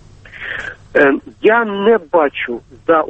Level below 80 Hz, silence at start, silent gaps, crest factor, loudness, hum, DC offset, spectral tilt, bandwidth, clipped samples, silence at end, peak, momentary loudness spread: -48 dBFS; 0.35 s; none; 16 dB; -15 LUFS; none; under 0.1%; -6.5 dB/octave; 8 kHz; under 0.1%; 0 s; 0 dBFS; 12 LU